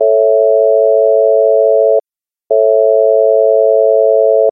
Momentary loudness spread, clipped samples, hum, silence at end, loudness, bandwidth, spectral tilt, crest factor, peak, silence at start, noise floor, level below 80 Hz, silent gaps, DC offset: 2 LU; under 0.1%; none; 0 s; -10 LUFS; 0.9 kHz; -11 dB/octave; 8 dB; 0 dBFS; 0 s; -89 dBFS; -80 dBFS; none; under 0.1%